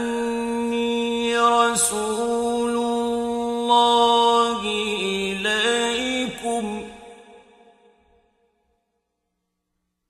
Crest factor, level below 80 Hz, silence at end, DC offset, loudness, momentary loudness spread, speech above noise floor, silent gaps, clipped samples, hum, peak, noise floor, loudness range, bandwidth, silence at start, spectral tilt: 18 dB; -56 dBFS; 2.7 s; under 0.1%; -21 LUFS; 9 LU; 59 dB; none; under 0.1%; none; -4 dBFS; -77 dBFS; 11 LU; 15.5 kHz; 0 s; -2.5 dB/octave